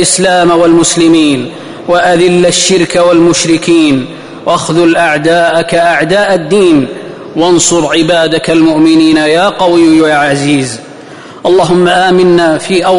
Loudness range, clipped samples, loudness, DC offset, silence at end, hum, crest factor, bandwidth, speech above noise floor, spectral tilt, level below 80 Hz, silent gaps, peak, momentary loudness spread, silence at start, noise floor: 1 LU; under 0.1%; -7 LUFS; 0.3%; 0 s; none; 8 dB; 11 kHz; 21 dB; -4 dB/octave; -42 dBFS; none; 0 dBFS; 7 LU; 0 s; -28 dBFS